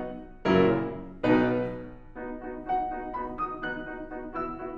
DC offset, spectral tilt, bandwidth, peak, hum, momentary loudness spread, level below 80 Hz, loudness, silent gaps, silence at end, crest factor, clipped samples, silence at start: under 0.1%; -8.5 dB/octave; 7.2 kHz; -8 dBFS; none; 16 LU; -48 dBFS; -29 LUFS; none; 0 s; 22 dB; under 0.1%; 0 s